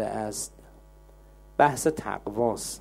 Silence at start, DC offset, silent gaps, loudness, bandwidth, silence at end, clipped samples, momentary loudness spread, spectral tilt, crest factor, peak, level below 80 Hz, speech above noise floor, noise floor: 0 s; under 0.1%; none; -27 LUFS; 16 kHz; 0 s; under 0.1%; 12 LU; -4 dB/octave; 24 dB; -6 dBFS; -52 dBFS; 25 dB; -52 dBFS